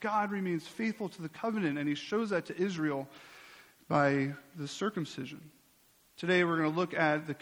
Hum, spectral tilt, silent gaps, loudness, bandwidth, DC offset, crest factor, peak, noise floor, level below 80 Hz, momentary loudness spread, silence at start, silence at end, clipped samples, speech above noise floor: none; -6 dB/octave; none; -33 LUFS; 17 kHz; under 0.1%; 20 dB; -14 dBFS; -66 dBFS; -74 dBFS; 14 LU; 0 s; 0.05 s; under 0.1%; 33 dB